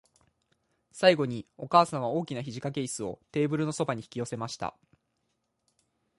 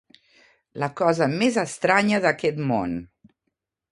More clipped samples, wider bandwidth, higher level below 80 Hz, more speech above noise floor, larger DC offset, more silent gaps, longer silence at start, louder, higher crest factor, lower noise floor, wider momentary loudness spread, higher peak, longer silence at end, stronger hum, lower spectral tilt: neither; about the same, 11.5 kHz vs 11.5 kHz; second, -68 dBFS vs -58 dBFS; second, 50 dB vs 57 dB; neither; neither; first, 0.95 s vs 0.75 s; second, -29 LUFS vs -22 LUFS; about the same, 24 dB vs 22 dB; about the same, -78 dBFS vs -79 dBFS; about the same, 12 LU vs 11 LU; second, -6 dBFS vs -2 dBFS; first, 1.5 s vs 0.85 s; neither; about the same, -5 dB/octave vs -5.5 dB/octave